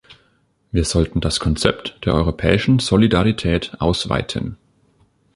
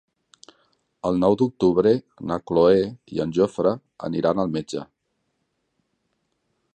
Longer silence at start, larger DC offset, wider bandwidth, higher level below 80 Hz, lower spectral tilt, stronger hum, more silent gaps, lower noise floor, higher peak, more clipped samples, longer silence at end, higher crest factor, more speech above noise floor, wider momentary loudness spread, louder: second, 0.1 s vs 1.05 s; neither; first, 11.5 kHz vs 9 kHz; first, -32 dBFS vs -54 dBFS; second, -5.5 dB/octave vs -7.5 dB/octave; neither; neither; second, -61 dBFS vs -74 dBFS; first, 0 dBFS vs -4 dBFS; neither; second, 0.8 s vs 1.9 s; about the same, 20 dB vs 18 dB; second, 44 dB vs 53 dB; about the same, 9 LU vs 11 LU; first, -18 LUFS vs -22 LUFS